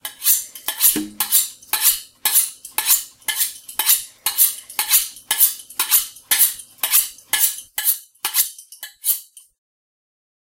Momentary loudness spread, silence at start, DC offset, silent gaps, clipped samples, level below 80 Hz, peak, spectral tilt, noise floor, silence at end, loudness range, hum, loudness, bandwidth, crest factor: 7 LU; 0.05 s; under 0.1%; none; under 0.1%; -62 dBFS; 0 dBFS; 2 dB/octave; -39 dBFS; 1.2 s; 3 LU; none; -17 LUFS; 17 kHz; 22 dB